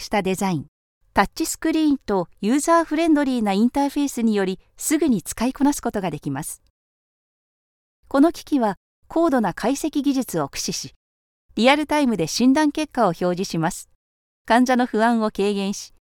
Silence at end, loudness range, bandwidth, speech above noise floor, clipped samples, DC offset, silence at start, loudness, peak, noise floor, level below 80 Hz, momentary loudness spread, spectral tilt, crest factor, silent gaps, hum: 0.15 s; 4 LU; 18 kHz; over 70 dB; under 0.1%; under 0.1%; 0 s; -21 LUFS; -2 dBFS; under -90 dBFS; -50 dBFS; 9 LU; -4.5 dB/octave; 20 dB; 0.68-1.01 s, 6.70-8.03 s, 8.77-9.02 s, 10.96-11.49 s, 13.95-14.45 s; none